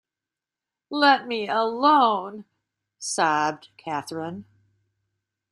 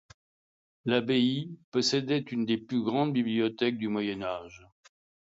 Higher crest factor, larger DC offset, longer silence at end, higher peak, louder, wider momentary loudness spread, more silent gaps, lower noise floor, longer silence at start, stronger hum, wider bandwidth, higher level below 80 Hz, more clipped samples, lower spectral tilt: about the same, 20 dB vs 18 dB; neither; first, 1.1 s vs 0.65 s; first, -4 dBFS vs -12 dBFS; first, -23 LUFS vs -29 LUFS; first, 18 LU vs 9 LU; second, none vs 1.64-1.72 s; about the same, -89 dBFS vs under -90 dBFS; about the same, 0.9 s vs 0.85 s; neither; first, 12.5 kHz vs 7.8 kHz; about the same, -74 dBFS vs -70 dBFS; neither; second, -3 dB/octave vs -5 dB/octave